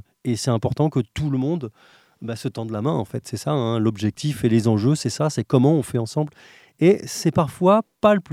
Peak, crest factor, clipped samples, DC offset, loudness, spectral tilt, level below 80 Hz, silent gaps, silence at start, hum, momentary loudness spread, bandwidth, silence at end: -2 dBFS; 20 dB; under 0.1%; under 0.1%; -21 LUFS; -6.5 dB/octave; -54 dBFS; none; 0.25 s; none; 11 LU; 15 kHz; 0 s